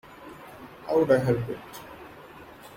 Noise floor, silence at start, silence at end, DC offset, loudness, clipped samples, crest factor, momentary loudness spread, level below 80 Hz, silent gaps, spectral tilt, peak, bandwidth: -47 dBFS; 0.1 s; 0 s; under 0.1%; -25 LUFS; under 0.1%; 20 dB; 24 LU; -58 dBFS; none; -7.5 dB/octave; -10 dBFS; 16.5 kHz